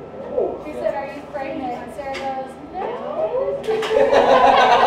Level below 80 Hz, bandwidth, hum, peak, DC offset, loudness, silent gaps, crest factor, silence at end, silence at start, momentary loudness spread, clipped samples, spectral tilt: -50 dBFS; 12 kHz; none; -2 dBFS; under 0.1%; -20 LUFS; none; 16 dB; 0 s; 0 s; 16 LU; under 0.1%; -4 dB/octave